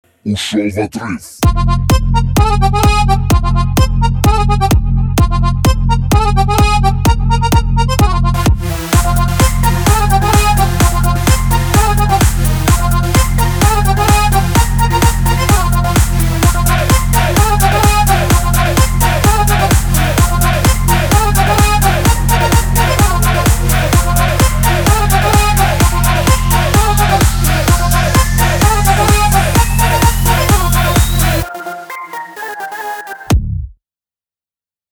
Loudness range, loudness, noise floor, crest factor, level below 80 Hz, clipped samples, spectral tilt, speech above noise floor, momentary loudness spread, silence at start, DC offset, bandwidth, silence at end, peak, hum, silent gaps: 2 LU; -12 LUFS; under -90 dBFS; 10 dB; -16 dBFS; under 0.1%; -4.5 dB/octave; over 79 dB; 5 LU; 0.25 s; under 0.1%; over 20 kHz; 1.2 s; 0 dBFS; none; none